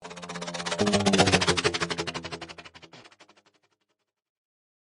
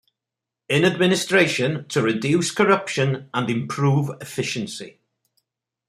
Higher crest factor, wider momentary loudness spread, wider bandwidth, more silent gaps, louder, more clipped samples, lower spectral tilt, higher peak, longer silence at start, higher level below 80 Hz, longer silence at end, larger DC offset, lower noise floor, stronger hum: about the same, 24 dB vs 20 dB; first, 20 LU vs 10 LU; second, 11.5 kHz vs 15 kHz; neither; second, -25 LUFS vs -21 LUFS; neither; second, -3.5 dB/octave vs -5 dB/octave; about the same, -4 dBFS vs -2 dBFS; second, 0 s vs 0.7 s; first, -58 dBFS vs -64 dBFS; first, 1.8 s vs 1 s; neither; second, -79 dBFS vs -86 dBFS; neither